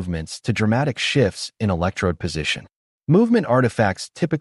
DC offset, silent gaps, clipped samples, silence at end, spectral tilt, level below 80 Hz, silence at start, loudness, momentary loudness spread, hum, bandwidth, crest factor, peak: under 0.1%; 2.76-3.00 s; under 0.1%; 0 s; -6 dB/octave; -44 dBFS; 0 s; -21 LUFS; 9 LU; none; 11.5 kHz; 16 dB; -4 dBFS